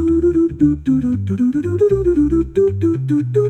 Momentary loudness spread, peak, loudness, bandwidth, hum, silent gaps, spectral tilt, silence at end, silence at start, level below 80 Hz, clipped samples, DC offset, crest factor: 3 LU; -2 dBFS; -16 LUFS; 8.6 kHz; none; none; -10 dB/octave; 0 s; 0 s; -34 dBFS; under 0.1%; under 0.1%; 12 dB